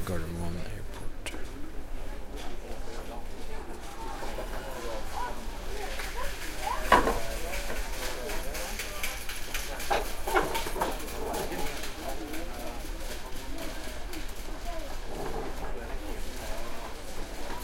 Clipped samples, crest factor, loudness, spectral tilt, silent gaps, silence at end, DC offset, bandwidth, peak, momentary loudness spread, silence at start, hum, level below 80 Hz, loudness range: under 0.1%; 28 dB; -35 LUFS; -3.5 dB/octave; none; 0 s; under 0.1%; 16.5 kHz; -4 dBFS; 11 LU; 0 s; none; -38 dBFS; 10 LU